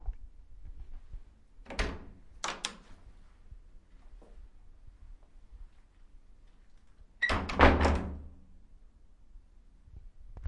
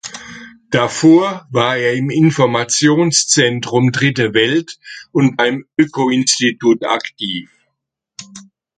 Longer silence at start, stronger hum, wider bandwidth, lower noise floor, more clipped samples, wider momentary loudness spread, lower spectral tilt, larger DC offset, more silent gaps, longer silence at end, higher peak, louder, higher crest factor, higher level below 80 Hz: about the same, 0.05 s vs 0.05 s; neither; first, 11.5 kHz vs 9.4 kHz; second, -57 dBFS vs -75 dBFS; neither; first, 30 LU vs 13 LU; about the same, -5 dB/octave vs -4 dB/octave; neither; neither; second, 0 s vs 0.35 s; second, -6 dBFS vs 0 dBFS; second, -30 LUFS vs -14 LUFS; first, 30 dB vs 16 dB; first, -42 dBFS vs -58 dBFS